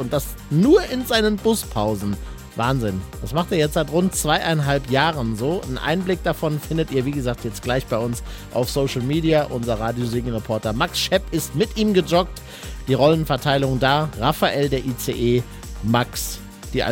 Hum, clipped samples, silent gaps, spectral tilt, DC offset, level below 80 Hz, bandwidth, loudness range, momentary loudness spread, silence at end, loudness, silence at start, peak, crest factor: none; under 0.1%; none; -5 dB/octave; under 0.1%; -36 dBFS; 17 kHz; 3 LU; 9 LU; 0 s; -21 LUFS; 0 s; -2 dBFS; 18 dB